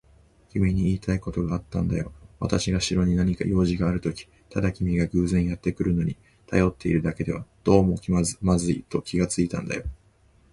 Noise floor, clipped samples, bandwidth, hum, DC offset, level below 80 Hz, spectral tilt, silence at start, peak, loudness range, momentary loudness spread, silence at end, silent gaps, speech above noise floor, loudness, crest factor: -59 dBFS; under 0.1%; 11.5 kHz; none; under 0.1%; -38 dBFS; -6.5 dB/octave; 0.55 s; -4 dBFS; 1 LU; 9 LU; 0.6 s; none; 35 dB; -25 LUFS; 22 dB